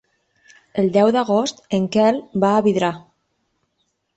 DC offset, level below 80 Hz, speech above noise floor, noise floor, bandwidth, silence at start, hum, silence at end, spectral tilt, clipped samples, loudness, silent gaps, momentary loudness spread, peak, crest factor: under 0.1%; -60 dBFS; 53 dB; -71 dBFS; 8.2 kHz; 0.75 s; none; 1.2 s; -6 dB/octave; under 0.1%; -18 LUFS; none; 7 LU; -4 dBFS; 16 dB